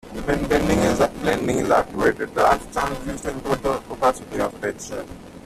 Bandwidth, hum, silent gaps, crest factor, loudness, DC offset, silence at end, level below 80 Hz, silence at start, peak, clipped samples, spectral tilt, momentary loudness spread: 15 kHz; none; none; 18 dB; -22 LUFS; under 0.1%; 0.05 s; -38 dBFS; 0.05 s; -4 dBFS; under 0.1%; -5 dB/octave; 10 LU